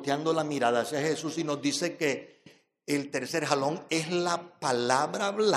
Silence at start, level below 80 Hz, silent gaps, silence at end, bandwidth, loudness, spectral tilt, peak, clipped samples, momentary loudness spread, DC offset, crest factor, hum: 0 s; -80 dBFS; none; 0 s; 15 kHz; -29 LUFS; -4 dB/octave; -8 dBFS; under 0.1%; 5 LU; under 0.1%; 22 dB; none